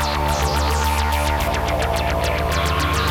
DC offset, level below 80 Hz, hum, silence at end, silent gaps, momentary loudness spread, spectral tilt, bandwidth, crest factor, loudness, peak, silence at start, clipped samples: under 0.1%; -26 dBFS; none; 0 s; none; 1 LU; -4.5 dB/octave; 18.5 kHz; 14 dB; -20 LUFS; -6 dBFS; 0 s; under 0.1%